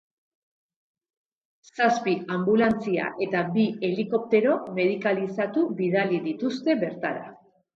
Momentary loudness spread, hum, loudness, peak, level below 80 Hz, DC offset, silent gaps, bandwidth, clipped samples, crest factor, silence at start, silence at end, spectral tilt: 7 LU; none; -25 LUFS; -8 dBFS; -68 dBFS; under 0.1%; none; 7.6 kHz; under 0.1%; 18 dB; 1.75 s; 0.4 s; -7 dB/octave